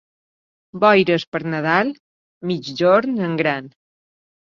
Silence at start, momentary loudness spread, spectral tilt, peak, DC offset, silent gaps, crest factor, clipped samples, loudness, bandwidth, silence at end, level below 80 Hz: 0.75 s; 12 LU; -6.5 dB/octave; -2 dBFS; under 0.1%; 1.27-1.32 s, 2.00-2.41 s; 18 dB; under 0.1%; -19 LUFS; 7.4 kHz; 0.9 s; -64 dBFS